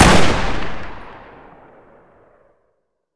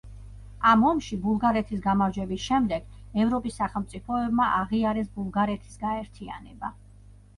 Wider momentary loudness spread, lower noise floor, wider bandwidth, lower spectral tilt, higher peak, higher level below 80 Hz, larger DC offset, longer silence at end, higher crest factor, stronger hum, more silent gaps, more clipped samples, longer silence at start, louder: first, 26 LU vs 16 LU; first, -69 dBFS vs -51 dBFS; about the same, 11 kHz vs 11 kHz; second, -4.5 dB/octave vs -6.5 dB/octave; first, 0 dBFS vs -8 dBFS; first, -30 dBFS vs -46 dBFS; neither; first, 2.05 s vs 0.25 s; about the same, 16 dB vs 18 dB; second, none vs 50 Hz at -45 dBFS; neither; neither; about the same, 0 s vs 0.05 s; first, -18 LUFS vs -26 LUFS